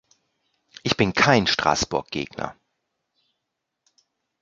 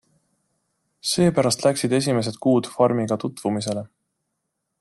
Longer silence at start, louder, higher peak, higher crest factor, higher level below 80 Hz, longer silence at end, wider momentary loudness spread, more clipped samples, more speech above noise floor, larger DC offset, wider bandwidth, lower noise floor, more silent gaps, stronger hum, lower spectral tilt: second, 0.85 s vs 1.05 s; about the same, -21 LUFS vs -22 LUFS; about the same, -2 dBFS vs -4 dBFS; first, 24 dB vs 18 dB; first, -50 dBFS vs -62 dBFS; first, 1.9 s vs 0.95 s; first, 14 LU vs 7 LU; neither; about the same, 59 dB vs 57 dB; neither; second, 9.4 kHz vs 12.5 kHz; about the same, -81 dBFS vs -78 dBFS; neither; neither; about the same, -4 dB/octave vs -5 dB/octave